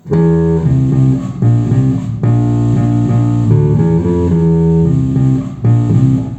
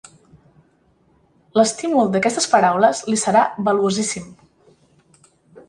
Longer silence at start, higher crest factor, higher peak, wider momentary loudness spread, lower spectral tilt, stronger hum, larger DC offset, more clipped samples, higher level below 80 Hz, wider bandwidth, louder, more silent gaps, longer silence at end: second, 0.05 s vs 1.55 s; second, 10 dB vs 18 dB; about the same, 0 dBFS vs -2 dBFS; second, 3 LU vs 7 LU; first, -10.5 dB/octave vs -4 dB/octave; neither; neither; neither; first, -32 dBFS vs -60 dBFS; second, 8 kHz vs 11.5 kHz; first, -12 LUFS vs -18 LUFS; neither; about the same, 0 s vs 0.1 s